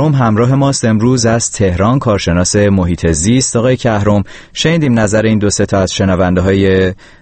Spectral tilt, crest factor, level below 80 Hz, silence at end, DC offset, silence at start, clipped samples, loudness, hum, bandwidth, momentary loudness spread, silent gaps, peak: -5.5 dB/octave; 12 dB; -32 dBFS; 0.3 s; under 0.1%; 0 s; under 0.1%; -12 LUFS; none; 8.8 kHz; 3 LU; none; 0 dBFS